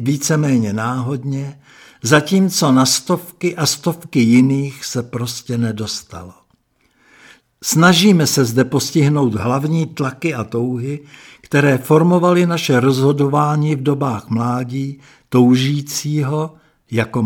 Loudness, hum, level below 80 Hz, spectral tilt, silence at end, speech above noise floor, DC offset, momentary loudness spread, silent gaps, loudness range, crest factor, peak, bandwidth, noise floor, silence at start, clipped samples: -16 LUFS; none; -56 dBFS; -5 dB/octave; 0 s; 44 dB; under 0.1%; 12 LU; none; 4 LU; 16 dB; 0 dBFS; 18 kHz; -60 dBFS; 0 s; under 0.1%